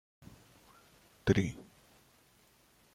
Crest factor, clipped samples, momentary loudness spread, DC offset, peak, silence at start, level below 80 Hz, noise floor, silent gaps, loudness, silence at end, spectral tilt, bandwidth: 26 dB; under 0.1%; 27 LU; under 0.1%; -12 dBFS; 1.25 s; -58 dBFS; -66 dBFS; none; -33 LUFS; 1.3 s; -6.5 dB/octave; 16 kHz